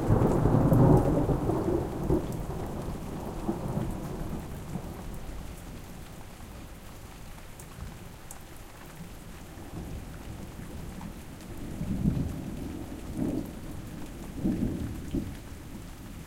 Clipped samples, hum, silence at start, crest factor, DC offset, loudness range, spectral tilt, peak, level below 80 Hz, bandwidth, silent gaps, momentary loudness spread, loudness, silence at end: under 0.1%; none; 0 s; 24 dB; under 0.1%; 17 LU; -8 dB/octave; -8 dBFS; -40 dBFS; 17 kHz; none; 21 LU; -31 LUFS; 0 s